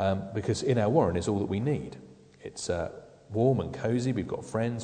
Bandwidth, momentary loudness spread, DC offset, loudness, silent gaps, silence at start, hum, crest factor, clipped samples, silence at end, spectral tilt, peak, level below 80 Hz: 9.4 kHz; 17 LU; under 0.1%; -29 LUFS; none; 0 s; none; 18 dB; under 0.1%; 0 s; -6.5 dB/octave; -10 dBFS; -54 dBFS